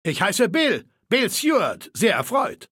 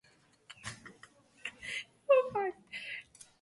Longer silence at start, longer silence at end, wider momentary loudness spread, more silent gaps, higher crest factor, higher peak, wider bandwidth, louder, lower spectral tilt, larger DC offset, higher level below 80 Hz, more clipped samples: second, 0.05 s vs 0.5 s; second, 0.05 s vs 0.4 s; second, 5 LU vs 24 LU; neither; about the same, 18 dB vs 22 dB; first, -4 dBFS vs -14 dBFS; first, 17 kHz vs 11.5 kHz; first, -21 LUFS vs -35 LUFS; about the same, -3.5 dB/octave vs -3.5 dB/octave; neither; first, -66 dBFS vs -74 dBFS; neither